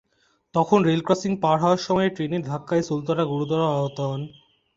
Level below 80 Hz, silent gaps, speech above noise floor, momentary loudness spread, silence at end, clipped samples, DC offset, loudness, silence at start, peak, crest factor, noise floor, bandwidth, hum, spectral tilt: -60 dBFS; none; 44 dB; 9 LU; 0.5 s; under 0.1%; under 0.1%; -23 LUFS; 0.55 s; -4 dBFS; 18 dB; -66 dBFS; 7.8 kHz; none; -6.5 dB/octave